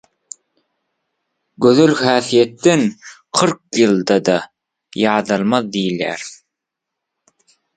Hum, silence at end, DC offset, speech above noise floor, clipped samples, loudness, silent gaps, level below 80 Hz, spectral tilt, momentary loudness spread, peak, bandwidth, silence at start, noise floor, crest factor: none; 1.4 s; under 0.1%; 66 dB; under 0.1%; -16 LUFS; none; -62 dBFS; -4.5 dB/octave; 20 LU; 0 dBFS; 9.4 kHz; 1.6 s; -81 dBFS; 18 dB